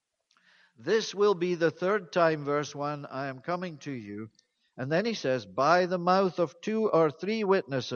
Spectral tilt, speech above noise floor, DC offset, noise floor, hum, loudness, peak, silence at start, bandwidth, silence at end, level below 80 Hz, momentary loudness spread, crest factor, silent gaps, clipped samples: -5.5 dB/octave; 40 dB; under 0.1%; -68 dBFS; none; -28 LUFS; -8 dBFS; 0.8 s; 7.2 kHz; 0 s; -76 dBFS; 14 LU; 20 dB; none; under 0.1%